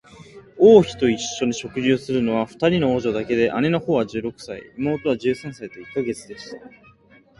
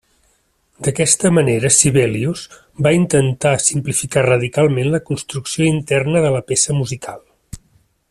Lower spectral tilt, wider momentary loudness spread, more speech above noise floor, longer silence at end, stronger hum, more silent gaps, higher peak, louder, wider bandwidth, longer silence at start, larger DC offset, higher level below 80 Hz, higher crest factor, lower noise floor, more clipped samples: about the same, -5.5 dB/octave vs -4.5 dB/octave; first, 20 LU vs 11 LU; second, 32 dB vs 45 dB; first, 0.7 s vs 0.55 s; neither; neither; about the same, 0 dBFS vs 0 dBFS; second, -20 LUFS vs -16 LUFS; second, 11.5 kHz vs 14.5 kHz; second, 0.2 s vs 0.8 s; neither; about the same, -52 dBFS vs -48 dBFS; about the same, 20 dB vs 16 dB; second, -53 dBFS vs -61 dBFS; neither